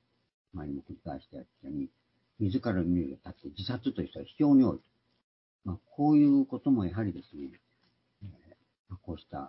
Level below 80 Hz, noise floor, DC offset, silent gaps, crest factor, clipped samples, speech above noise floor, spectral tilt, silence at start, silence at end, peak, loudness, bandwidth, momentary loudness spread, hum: -58 dBFS; -73 dBFS; under 0.1%; 5.24-5.59 s, 8.79-8.85 s; 16 dB; under 0.1%; 43 dB; -11.5 dB/octave; 0.55 s; 0 s; -14 dBFS; -29 LUFS; 5.8 kHz; 24 LU; none